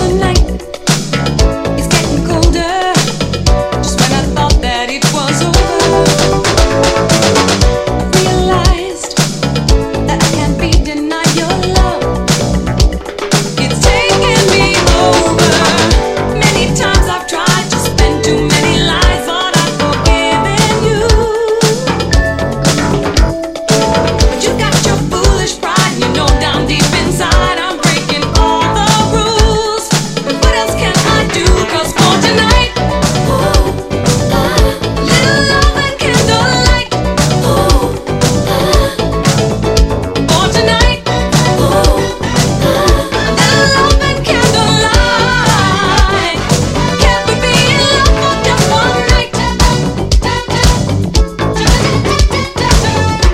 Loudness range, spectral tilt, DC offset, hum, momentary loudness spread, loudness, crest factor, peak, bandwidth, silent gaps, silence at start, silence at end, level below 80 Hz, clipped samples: 3 LU; -4 dB/octave; under 0.1%; none; 5 LU; -11 LUFS; 10 dB; 0 dBFS; 16 kHz; none; 0 s; 0 s; -16 dBFS; 0.2%